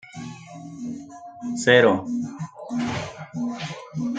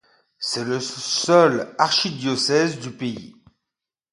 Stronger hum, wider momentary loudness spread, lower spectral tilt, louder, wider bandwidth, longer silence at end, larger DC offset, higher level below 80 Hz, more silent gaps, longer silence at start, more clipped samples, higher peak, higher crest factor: neither; first, 22 LU vs 14 LU; first, -5 dB/octave vs -3.5 dB/octave; about the same, -23 LUFS vs -21 LUFS; second, 9.4 kHz vs 11.5 kHz; second, 0 s vs 0.85 s; neither; first, -60 dBFS vs -66 dBFS; neither; second, 0.05 s vs 0.4 s; neither; about the same, -2 dBFS vs -2 dBFS; about the same, 24 dB vs 20 dB